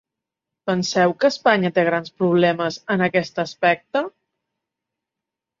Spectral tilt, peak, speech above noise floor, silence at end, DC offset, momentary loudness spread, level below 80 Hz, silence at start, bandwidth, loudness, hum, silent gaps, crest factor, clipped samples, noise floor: -5.5 dB/octave; -2 dBFS; 66 dB; 1.5 s; under 0.1%; 8 LU; -66 dBFS; 0.65 s; 7.6 kHz; -20 LUFS; none; none; 20 dB; under 0.1%; -85 dBFS